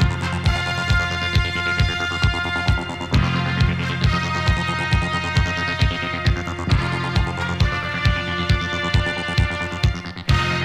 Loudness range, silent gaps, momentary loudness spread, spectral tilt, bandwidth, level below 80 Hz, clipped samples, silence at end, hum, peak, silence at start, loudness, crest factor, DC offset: 1 LU; none; 2 LU; -5.5 dB/octave; 13 kHz; -28 dBFS; under 0.1%; 0 s; none; -2 dBFS; 0 s; -21 LUFS; 18 dB; under 0.1%